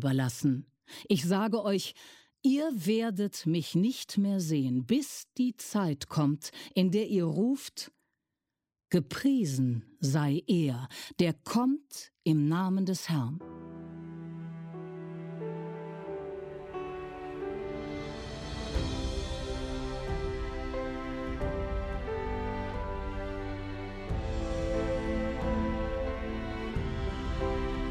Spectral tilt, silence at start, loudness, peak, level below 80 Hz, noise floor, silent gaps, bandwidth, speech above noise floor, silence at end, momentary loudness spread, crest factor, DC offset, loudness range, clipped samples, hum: -6 dB/octave; 0 s; -32 LUFS; -14 dBFS; -42 dBFS; -89 dBFS; none; 16.5 kHz; 59 dB; 0 s; 13 LU; 18 dB; under 0.1%; 9 LU; under 0.1%; none